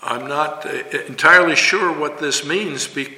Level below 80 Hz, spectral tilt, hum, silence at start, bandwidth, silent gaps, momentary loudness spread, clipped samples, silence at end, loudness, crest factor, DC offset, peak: -66 dBFS; -2 dB/octave; none; 0 s; 16.5 kHz; none; 13 LU; under 0.1%; 0 s; -16 LUFS; 18 dB; under 0.1%; 0 dBFS